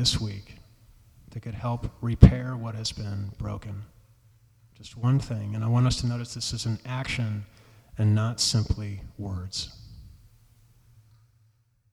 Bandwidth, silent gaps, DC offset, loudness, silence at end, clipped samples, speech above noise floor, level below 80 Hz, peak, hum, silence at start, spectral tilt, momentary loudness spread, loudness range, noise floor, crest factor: 13 kHz; none; under 0.1%; -27 LUFS; 1.85 s; under 0.1%; 39 dB; -38 dBFS; -2 dBFS; none; 0 s; -5.5 dB/octave; 17 LU; 6 LU; -65 dBFS; 26 dB